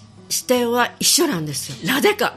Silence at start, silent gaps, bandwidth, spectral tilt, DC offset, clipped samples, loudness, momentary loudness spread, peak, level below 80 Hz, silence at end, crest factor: 0 s; none; 15.5 kHz; -2.5 dB/octave; under 0.1%; under 0.1%; -18 LUFS; 9 LU; -2 dBFS; -60 dBFS; 0 s; 18 dB